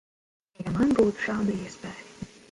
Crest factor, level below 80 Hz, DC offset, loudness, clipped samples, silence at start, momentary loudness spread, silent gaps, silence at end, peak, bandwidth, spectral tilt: 18 dB; -54 dBFS; under 0.1%; -26 LUFS; under 0.1%; 0.6 s; 19 LU; none; 0.25 s; -10 dBFS; 11.5 kHz; -6.5 dB/octave